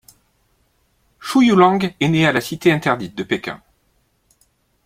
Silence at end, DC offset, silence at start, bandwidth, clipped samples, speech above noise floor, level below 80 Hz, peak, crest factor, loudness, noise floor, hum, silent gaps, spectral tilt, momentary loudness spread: 1.3 s; under 0.1%; 1.2 s; 16 kHz; under 0.1%; 47 dB; -56 dBFS; -2 dBFS; 18 dB; -17 LUFS; -63 dBFS; none; none; -6 dB/octave; 14 LU